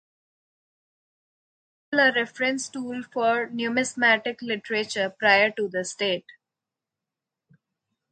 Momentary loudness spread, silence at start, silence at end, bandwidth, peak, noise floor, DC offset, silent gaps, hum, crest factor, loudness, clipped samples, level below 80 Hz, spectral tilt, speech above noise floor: 11 LU; 1.9 s; 1.9 s; 9.4 kHz; -4 dBFS; -88 dBFS; under 0.1%; none; none; 24 dB; -24 LUFS; under 0.1%; -76 dBFS; -2.5 dB/octave; 63 dB